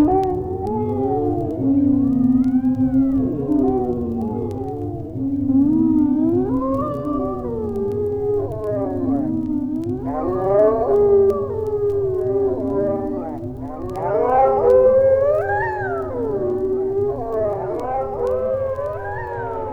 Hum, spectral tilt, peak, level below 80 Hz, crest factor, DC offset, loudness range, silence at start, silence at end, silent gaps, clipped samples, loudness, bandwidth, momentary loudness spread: none; -10.5 dB/octave; -4 dBFS; -40 dBFS; 14 dB; under 0.1%; 5 LU; 0 s; 0 s; none; under 0.1%; -20 LUFS; 4.6 kHz; 10 LU